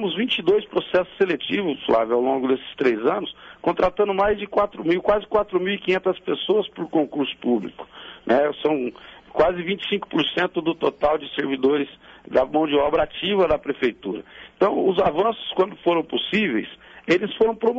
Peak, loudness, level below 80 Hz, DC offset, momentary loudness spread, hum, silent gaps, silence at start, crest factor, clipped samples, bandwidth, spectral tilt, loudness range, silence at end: -8 dBFS; -22 LUFS; -50 dBFS; under 0.1%; 6 LU; none; none; 0 s; 14 dB; under 0.1%; 7.6 kHz; -6.5 dB/octave; 2 LU; 0 s